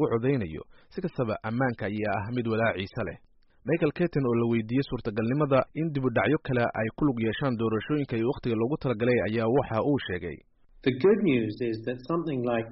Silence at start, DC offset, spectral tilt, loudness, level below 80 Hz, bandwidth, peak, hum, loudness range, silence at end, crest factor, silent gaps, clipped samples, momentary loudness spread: 0 s; under 0.1%; -6.5 dB/octave; -28 LUFS; -54 dBFS; 5.8 kHz; -14 dBFS; none; 3 LU; 0 s; 14 dB; none; under 0.1%; 9 LU